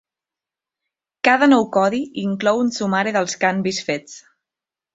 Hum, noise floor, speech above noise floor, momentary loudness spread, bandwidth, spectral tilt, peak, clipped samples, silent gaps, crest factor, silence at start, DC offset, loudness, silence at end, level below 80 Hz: none; -88 dBFS; 70 dB; 10 LU; 8 kHz; -4.5 dB/octave; -2 dBFS; under 0.1%; none; 18 dB; 1.25 s; under 0.1%; -19 LUFS; 0.75 s; -64 dBFS